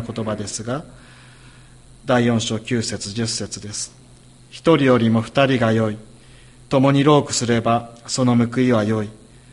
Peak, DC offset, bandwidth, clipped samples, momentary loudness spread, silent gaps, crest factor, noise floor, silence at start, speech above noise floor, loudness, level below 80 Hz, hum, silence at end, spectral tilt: -2 dBFS; under 0.1%; 11.5 kHz; under 0.1%; 13 LU; none; 18 dB; -46 dBFS; 0 s; 28 dB; -19 LUFS; -50 dBFS; none; 0.35 s; -5.5 dB/octave